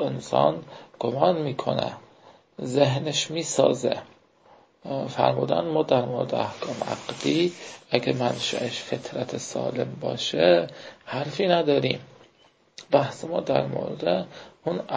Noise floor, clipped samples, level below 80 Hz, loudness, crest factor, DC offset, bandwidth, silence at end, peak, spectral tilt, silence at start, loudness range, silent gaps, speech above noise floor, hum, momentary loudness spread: -60 dBFS; under 0.1%; -64 dBFS; -25 LUFS; 24 dB; under 0.1%; 8 kHz; 0 s; -2 dBFS; -5 dB/octave; 0 s; 2 LU; none; 35 dB; none; 11 LU